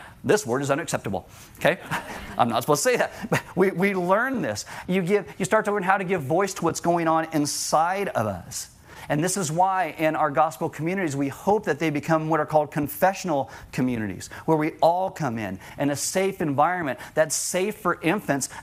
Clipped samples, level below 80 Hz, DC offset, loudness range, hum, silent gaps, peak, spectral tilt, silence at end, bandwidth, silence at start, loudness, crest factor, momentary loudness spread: under 0.1%; -58 dBFS; under 0.1%; 2 LU; none; none; -4 dBFS; -4.5 dB/octave; 0 s; 16 kHz; 0 s; -24 LUFS; 20 dB; 7 LU